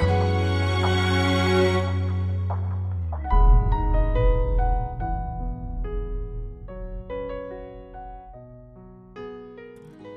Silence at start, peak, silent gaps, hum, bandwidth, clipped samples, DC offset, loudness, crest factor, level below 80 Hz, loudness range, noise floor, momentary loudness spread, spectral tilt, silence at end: 0 s; -8 dBFS; none; none; 9.4 kHz; under 0.1%; under 0.1%; -25 LUFS; 16 dB; -26 dBFS; 15 LU; -45 dBFS; 20 LU; -7 dB/octave; 0 s